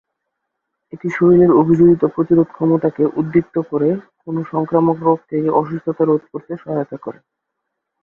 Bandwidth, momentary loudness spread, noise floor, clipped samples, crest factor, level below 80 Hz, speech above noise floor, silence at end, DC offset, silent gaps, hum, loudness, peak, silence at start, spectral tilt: 3.3 kHz; 14 LU; -77 dBFS; under 0.1%; 16 dB; -54 dBFS; 61 dB; 0.9 s; under 0.1%; none; none; -16 LUFS; 0 dBFS; 0.95 s; -11 dB/octave